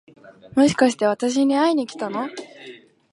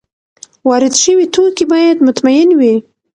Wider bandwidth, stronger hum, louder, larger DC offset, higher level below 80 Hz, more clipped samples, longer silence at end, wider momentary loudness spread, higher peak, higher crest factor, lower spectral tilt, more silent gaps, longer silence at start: about the same, 11.5 kHz vs 10.5 kHz; neither; second, -20 LUFS vs -10 LUFS; neither; second, -62 dBFS vs -56 dBFS; neither; about the same, 0.4 s vs 0.35 s; first, 18 LU vs 5 LU; about the same, -2 dBFS vs 0 dBFS; first, 18 dB vs 10 dB; first, -4.5 dB/octave vs -3 dB/octave; neither; second, 0.25 s vs 0.65 s